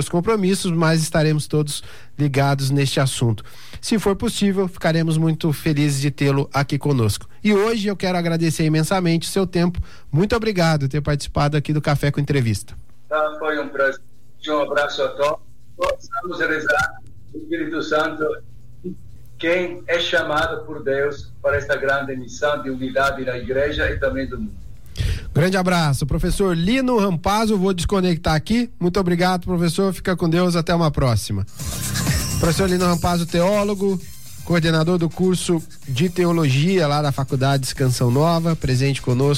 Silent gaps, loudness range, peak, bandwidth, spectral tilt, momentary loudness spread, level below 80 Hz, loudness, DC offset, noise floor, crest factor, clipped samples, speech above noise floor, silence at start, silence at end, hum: none; 4 LU; -8 dBFS; 16.5 kHz; -5.5 dB/octave; 8 LU; -36 dBFS; -20 LUFS; 2%; -40 dBFS; 12 dB; under 0.1%; 21 dB; 0 s; 0 s; none